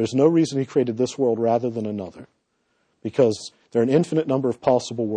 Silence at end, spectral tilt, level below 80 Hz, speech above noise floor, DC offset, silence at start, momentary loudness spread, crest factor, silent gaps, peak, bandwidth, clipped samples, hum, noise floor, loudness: 0 s; -6.5 dB/octave; -64 dBFS; 49 dB; under 0.1%; 0 s; 11 LU; 16 dB; none; -6 dBFS; 9.8 kHz; under 0.1%; none; -70 dBFS; -22 LUFS